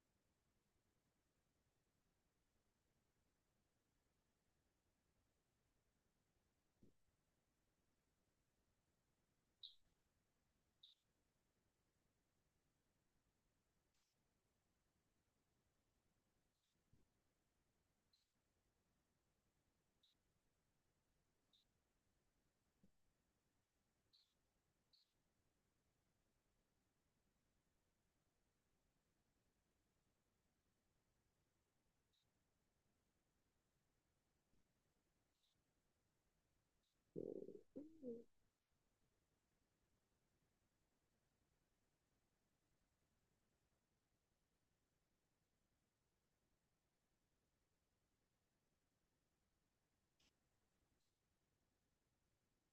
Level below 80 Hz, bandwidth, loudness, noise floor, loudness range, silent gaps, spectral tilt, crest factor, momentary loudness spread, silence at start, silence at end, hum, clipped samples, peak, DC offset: under -90 dBFS; 2.6 kHz; -58 LUFS; -90 dBFS; 5 LU; none; -7.5 dB/octave; 34 dB; 8 LU; 6.8 s; 2.45 s; none; under 0.1%; -38 dBFS; under 0.1%